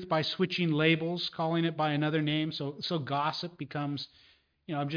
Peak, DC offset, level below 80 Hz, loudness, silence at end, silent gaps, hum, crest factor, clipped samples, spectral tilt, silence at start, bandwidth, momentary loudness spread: -12 dBFS; under 0.1%; -72 dBFS; -31 LUFS; 0 s; none; none; 18 dB; under 0.1%; -7 dB/octave; 0 s; 5.2 kHz; 10 LU